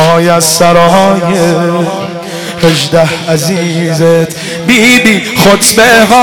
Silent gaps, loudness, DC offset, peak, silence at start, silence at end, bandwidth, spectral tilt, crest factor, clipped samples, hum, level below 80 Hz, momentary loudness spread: none; -7 LUFS; under 0.1%; 0 dBFS; 0 s; 0 s; 19.5 kHz; -4 dB/octave; 8 dB; 0.4%; none; -40 dBFS; 11 LU